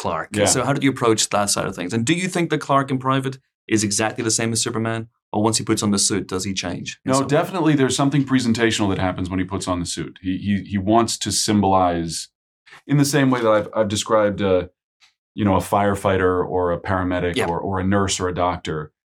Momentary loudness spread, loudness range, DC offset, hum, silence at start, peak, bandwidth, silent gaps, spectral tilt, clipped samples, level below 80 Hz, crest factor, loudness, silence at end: 8 LU; 2 LU; under 0.1%; none; 0 s; -4 dBFS; 18 kHz; 3.54-3.68 s, 5.22-5.32 s, 12.35-12.66 s, 14.83-15.00 s, 15.18-15.35 s; -4.5 dB/octave; under 0.1%; -50 dBFS; 16 dB; -20 LUFS; 0.25 s